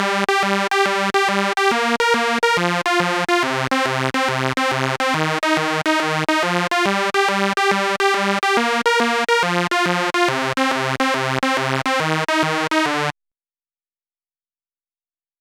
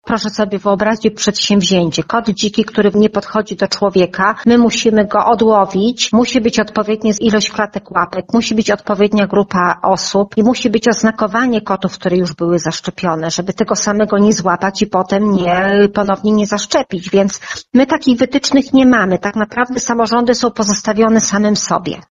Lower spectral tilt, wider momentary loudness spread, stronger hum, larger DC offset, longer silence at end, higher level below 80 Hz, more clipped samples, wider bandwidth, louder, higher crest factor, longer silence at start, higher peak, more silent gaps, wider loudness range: about the same, -4 dB/octave vs -4.5 dB/octave; second, 2 LU vs 6 LU; neither; neither; first, 2.3 s vs 0.1 s; second, -64 dBFS vs -46 dBFS; neither; first, 18.5 kHz vs 10.5 kHz; second, -18 LUFS vs -13 LUFS; first, 20 dB vs 12 dB; about the same, 0 s vs 0.05 s; about the same, 0 dBFS vs 0 dBFS; neither; about the same, 3 LU vs 2 LU